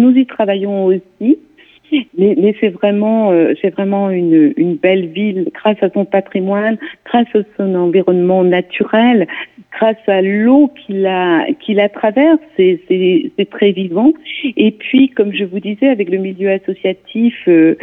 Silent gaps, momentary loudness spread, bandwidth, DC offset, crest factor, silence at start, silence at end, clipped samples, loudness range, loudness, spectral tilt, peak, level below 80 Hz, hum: none; 7 LU; 3.9 kHz; under 0.1%; 12 dB; 0 s; 0.05 s; under 0.1%; 2 LU; -13 LUFS; -9.5 dB/octave; 0 dBFS; -62 dBFS; none